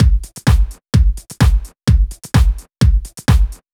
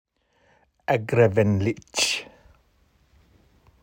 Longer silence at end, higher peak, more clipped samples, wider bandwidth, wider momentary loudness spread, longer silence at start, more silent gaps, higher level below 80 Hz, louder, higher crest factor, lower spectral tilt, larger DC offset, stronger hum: second, 0.2 s vs 1.6 s; first, 0 dBFS vs -6 dBFS; neither; about the same, 15.5 kHz vs 16.5 kHz; second, 3 LU vs 9 LU; second, 0 s vs 0.9 s; neither; first, -16 dBFS vs -60 dBFS; first, -16 LUFS vs -22 LUFS; second, 12 dB vs 20 dB; first, -6 dB/octave vs -4.5 dB/octave; neither; neither